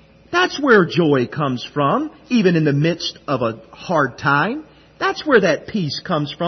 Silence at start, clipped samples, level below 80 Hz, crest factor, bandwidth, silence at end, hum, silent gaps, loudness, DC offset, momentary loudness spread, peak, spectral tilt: 0.3 s; under 0.1%; -56 dBFS; 18 dB; 6.4 kHz; 0 s; none; none; -18 LUFS; under 0.1%; 9 LU; 0 dBFS; -6 dB/octave